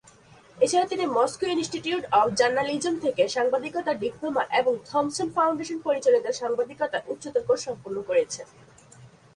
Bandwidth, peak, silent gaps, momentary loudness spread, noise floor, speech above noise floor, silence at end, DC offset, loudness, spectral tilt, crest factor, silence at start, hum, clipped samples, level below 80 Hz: 11 kHz; -8 dBFS; none; 7 LU; -53 dBFS; 28 dB; 0.3 s; under 0.1%; -25 LUFS; -3.5 dB/octave; 18 dB; 0.55 s; none; under 0.1%; -64 dBFS